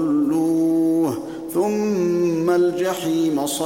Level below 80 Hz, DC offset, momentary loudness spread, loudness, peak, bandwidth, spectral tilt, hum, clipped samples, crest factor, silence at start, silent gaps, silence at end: -64 dBFS; 0.1%; 4 LU; -20 LUFS; -8 dBFS; 17 kHz; -5.5 dB/octave; none; under 0.1%; 10 dB; 0 s; none; 0 s